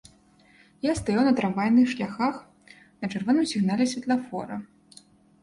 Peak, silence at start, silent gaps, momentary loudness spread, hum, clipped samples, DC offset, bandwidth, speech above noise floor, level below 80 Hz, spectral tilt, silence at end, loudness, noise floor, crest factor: -10 dBFS; 0.85 s; none; 13 LU; none; under 0.1%; under 0.1%; 11.5 kHz; 34 dB; -56 dBFS; -5.5 dB/octave; 0.75 s; -25 LUFS; -58 dBFS; 16 dB